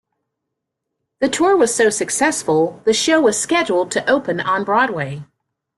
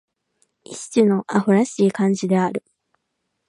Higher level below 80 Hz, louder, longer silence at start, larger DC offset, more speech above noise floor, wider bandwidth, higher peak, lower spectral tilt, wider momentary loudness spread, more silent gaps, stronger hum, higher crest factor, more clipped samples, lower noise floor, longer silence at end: first, -60 dBFS vs -70 dBFS; about the same, -17 LUFS vs -19 LUFS; first, 1.2 s vs 0.7 s; neither; first, 62 dB vs 57 dB; first, 12.5 kHz vs 11 kHz; about the same, -4 dBFS vs -4 dBFS; second, -3 dB/octave vs -6.5 dB/octave; second, 6 LU vs 14 LU; neither; neither; about the same, 14 dB vs 18 dB; neither; first, -79 dBFS vs -75 dBFS; second, 0.55 s vs 0.9 s